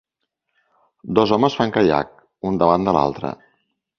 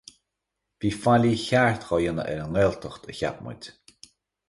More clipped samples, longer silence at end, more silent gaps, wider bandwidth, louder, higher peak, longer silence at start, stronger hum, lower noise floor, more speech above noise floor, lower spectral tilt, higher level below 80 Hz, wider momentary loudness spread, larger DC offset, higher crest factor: neither; second, 0.65 s vs 0.8 s; neither; second, 6.8 kHz vs 11.5 kHz; first, -19 LUFS vs -24 LUFS; first, 0 dBFS vs -8 dBFS; first, 1.05 s vs 0.8 s; neither; second, -77 dBFS vs -83 dBFS; about the same, 59 dB vs 58 dB; about the same, -7 dB/octave vs -6 dB/octave; about the same, -50 dBFS vs -50 dBFS; about the same, 15 LU vs 17 LU; neither; about the same, 20 dB vs 18 dB